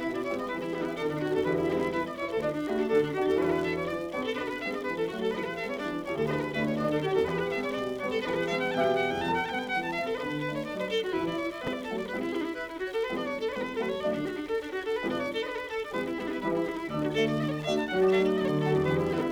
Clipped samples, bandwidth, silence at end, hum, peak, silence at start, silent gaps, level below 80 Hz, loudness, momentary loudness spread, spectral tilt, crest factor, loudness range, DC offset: under 0.1%; 19.5 kHz; 0 s; none; -14 dBFS; 0 s; none; -58 dBFS; -30 LUFS; 6 LU; -6 dB/octave; 16 dB; 3 LU; under 0.1%